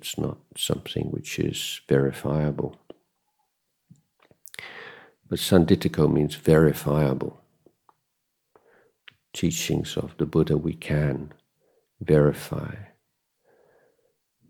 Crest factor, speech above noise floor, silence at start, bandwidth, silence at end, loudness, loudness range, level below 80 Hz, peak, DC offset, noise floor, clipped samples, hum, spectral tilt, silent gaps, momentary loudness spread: 22 dB; 54 dB; 0 s; 18.5 kHz; 1.65 s; -24 LUFS; 7 LU; -48 dBFS; -4 dBFS; under 0.1%; -77 dBFS; under 0.1%; none; -6 dB/octave; none; 19 LU